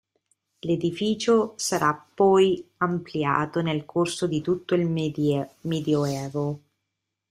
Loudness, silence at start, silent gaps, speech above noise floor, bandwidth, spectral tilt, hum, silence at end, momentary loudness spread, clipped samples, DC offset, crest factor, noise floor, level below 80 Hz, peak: -25 LUFS; 0.65 s; none; 58 dB; 15 kHz; -5.5 dB/octave; none; 0.75 s; 8 LU; under 0.1%; under 0.1%; 18 dB; -82 dBFS; -62 dBFS; -6 dBFS